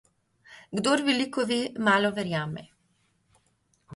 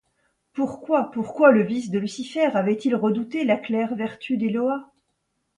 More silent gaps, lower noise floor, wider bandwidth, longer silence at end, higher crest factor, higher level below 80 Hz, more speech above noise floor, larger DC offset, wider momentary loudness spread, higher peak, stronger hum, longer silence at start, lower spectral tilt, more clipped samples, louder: neither; second, -70 dBFS vs -74 dBFS; about the same, 11.5 kHz vs 10.5 kHz; second, 0 s vs 0.75 s; about the same, 20 dB vs 22 dB; about the same, -68 dBFS vs -68 dBFS; second, 44 dB vs 52 dB; neither; about the same, 12 LU vs 11 LU; second, -10 dBFS vs -2 dBFS; neither; about the same, 0.5 s vs 0.55 s; second, -4.5 dB/octave vs -6.5 dB/octave; neither; second, -26 LUFS vs -23 LUFS